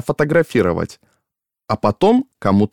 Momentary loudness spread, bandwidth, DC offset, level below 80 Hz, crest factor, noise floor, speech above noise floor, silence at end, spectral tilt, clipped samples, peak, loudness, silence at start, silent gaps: 9 LU; 15 kHz; under 0.1%; -46 dBFS; 16 dB; -80 dBFS; 63 dB; 0.05 s; -7.5 dB/octave; under 0.1%; -2 dBFS; -17 LUFS; 0.05 s; none